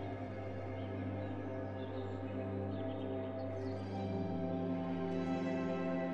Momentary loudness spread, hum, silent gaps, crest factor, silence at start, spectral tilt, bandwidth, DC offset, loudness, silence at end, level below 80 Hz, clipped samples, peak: 5 LU; 50 Hz at -60 dBFS; none; 14 dB; 0 s; -8.5 dB/octave; 7.6 kHz; under 0.1%; -40 LUFS; 0 s; -68 dBFS; under 0.1%; -26 dBFS